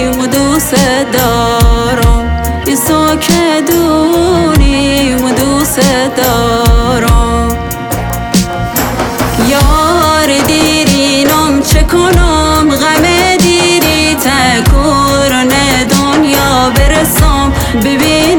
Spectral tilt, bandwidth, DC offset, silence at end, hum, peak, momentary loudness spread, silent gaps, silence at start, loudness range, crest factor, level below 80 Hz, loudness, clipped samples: -4.5 dB/octave; 20 kHz; under 0.1%; 0 s; none; 0 dBFS; 5 LU; none; 0 s; 3 LU; 8 dB; -16 dBFS; -9 LUFS; under 0.1%